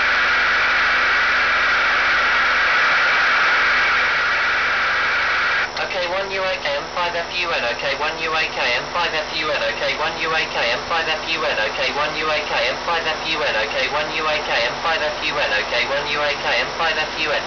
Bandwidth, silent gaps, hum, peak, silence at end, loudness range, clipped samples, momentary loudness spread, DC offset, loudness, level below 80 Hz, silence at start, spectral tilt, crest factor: 5.4 kHz; none; none; -8 dBFS; 0 s; 5 LU; under 0.1%; 6 LU; 0.3%; -18 LUFS; -46 dBFS; 0 s; -2 dB/octave; 12 dB